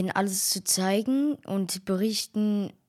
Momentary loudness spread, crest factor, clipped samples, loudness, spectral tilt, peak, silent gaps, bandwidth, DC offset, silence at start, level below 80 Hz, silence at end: 5 LU; 16 dB; under 0.1%; -26 LUFS; -3.5 dB/octave; -12 dBFS; none; 16 kHz; under 0.1%; 0 s; -72 dBFS; 0.15 s